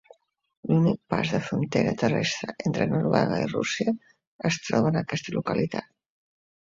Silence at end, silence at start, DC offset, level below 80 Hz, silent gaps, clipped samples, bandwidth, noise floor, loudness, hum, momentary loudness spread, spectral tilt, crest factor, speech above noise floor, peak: 0.8 s; 0.65 s; under 0.1%; -58 dBFS; 4.27-4.39 s; under 0.1%; 7.6 kHz; -57 dBFS; -26 LUFS; none; 6 LU; -6 dB/octave; 22 dB; 32 dB; -6 dBFS